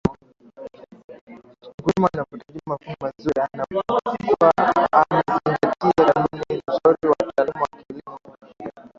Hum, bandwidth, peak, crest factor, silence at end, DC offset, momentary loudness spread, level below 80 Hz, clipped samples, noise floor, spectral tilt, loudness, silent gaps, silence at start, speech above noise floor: none; 7.6 kHz; -2 dBFS; 20 dB; 0.1 s; under 0.1%; 21 LU; -52 dBFS; under 0.1%; -46 dBFS; -7.5 dB/octave; -21 LUFS; 1.04-1.08 s, 1.21-1.27 s, 1.74-1.78 s; 0.05 s; 26 dB